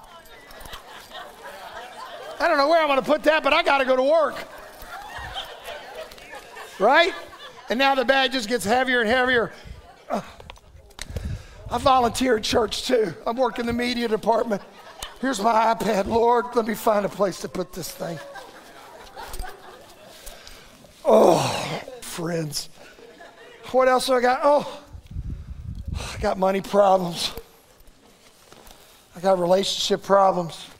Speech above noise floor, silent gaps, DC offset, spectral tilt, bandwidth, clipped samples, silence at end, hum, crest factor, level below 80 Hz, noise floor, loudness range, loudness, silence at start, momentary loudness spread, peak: 32 dB; none; under 0.1%; -4 dB/octave; 16 kHz; under 0.1%; 0.05 s; none; 22 dB; -46 dBFS; -53 dBFS; 5 LU; -21 LUFS; 0 s; 21 LU; -2 dBFS